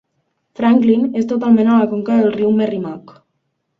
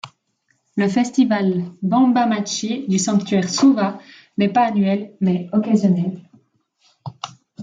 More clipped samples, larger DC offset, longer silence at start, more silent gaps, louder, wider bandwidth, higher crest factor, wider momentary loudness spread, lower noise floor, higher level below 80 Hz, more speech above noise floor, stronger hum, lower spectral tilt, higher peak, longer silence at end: neither; neither; first, 0.6 s vs 0.05 s; neither; first, -15 LUFS vs -18 LUFS; second, 6.2 kHz vs 9.4 kHz; about the same, 14 dB vs 14 dB; second, 10 LU vs 18 LU; about the same, -70 dBFS vs -67 dBFS; first, -60 dBFS vs -66 dBFS; first, 56 dB vs 49 dB; neither; first, -8.5 dB/octave vs -5.5 dB/octave; about the same, -2 dBFS vs -4 dBFS; first, 0.8 s vs 0 s